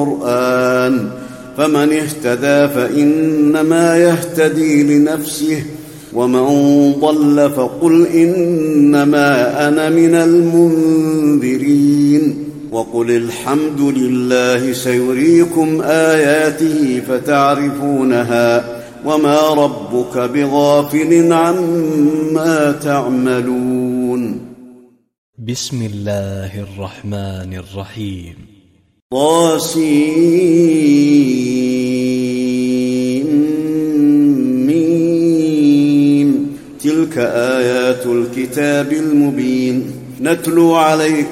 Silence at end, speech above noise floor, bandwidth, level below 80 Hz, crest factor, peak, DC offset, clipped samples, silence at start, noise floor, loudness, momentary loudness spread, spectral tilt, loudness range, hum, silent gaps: 0 s; 37 dB; 16 kHz; -52 dBFS; 12 dB; 0 dBFS; under 0.1%; under 0.1%; 0 s; -50 dBFS; -13 LUFS; 11 LU; -6 dB/octave; 7 LU; none; 25.18-25.33 s, 29.02-29.10 s